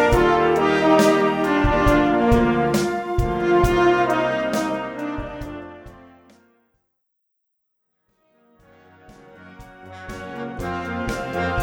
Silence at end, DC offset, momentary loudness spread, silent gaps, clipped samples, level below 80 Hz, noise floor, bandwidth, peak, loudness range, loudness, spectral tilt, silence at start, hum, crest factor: 0 s; under 0.1%; 17 LU; none; under 0.1%; -34 dBFS; -74 dBFS; 18.5 kHz; -4 dBFS; 20 LU; -19 LUFS; -6 dB/octave; 0 s; none; 18 dB